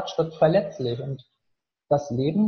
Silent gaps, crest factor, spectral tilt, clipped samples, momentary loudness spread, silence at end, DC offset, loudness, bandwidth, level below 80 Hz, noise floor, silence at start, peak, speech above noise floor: none; 18 dB; -7.5 dB/octave; under 0.1%; 13 LU; 0 s; under 0.1%; -24 LUFS; 6.8 kHz; -60 dBFS; -78 dBFS; 0 s; -8 dBFS; 55 dB